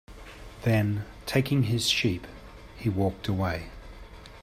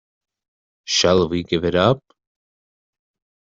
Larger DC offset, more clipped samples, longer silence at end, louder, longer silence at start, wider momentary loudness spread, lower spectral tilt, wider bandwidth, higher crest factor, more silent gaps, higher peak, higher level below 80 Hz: neither; neither; second, 0 s vs 1.45 s; second, -28 LUFS vs -18 LUFS; second, 0.1 s vs 0.85 s; first, 23 LU vs 8 LU; about the same, -5.5 dB/octave vs -4.5 dB/octave; first, 15.5 kHz vs 7.8 kHz; about the same, 18 dB vs 20 dB; neither; second, -10 dBFS vs -4 dBFS; about the same, -48 dBFS vs -52 dBFS